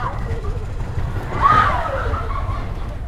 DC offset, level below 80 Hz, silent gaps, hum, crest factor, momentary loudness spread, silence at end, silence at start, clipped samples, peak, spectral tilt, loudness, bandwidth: under 0.1%; -26 dBFS; none; none; 18 dB; 13 LU; 0 s; 0 s; under 0.1%; -2 dBFS; -6.5 dB/octave; -21 LUFS; 12.5 kHz